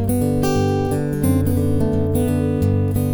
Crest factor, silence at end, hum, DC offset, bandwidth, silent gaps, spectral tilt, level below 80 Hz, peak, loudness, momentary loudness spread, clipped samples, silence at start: 12 dB; 0 s; none; under 0.1%; over 20 kHz; none; -7.5 dB/octave; -34 dBFS; -6 dBFS; -19 LUFS; 1 LU; under 0.1%; 0 s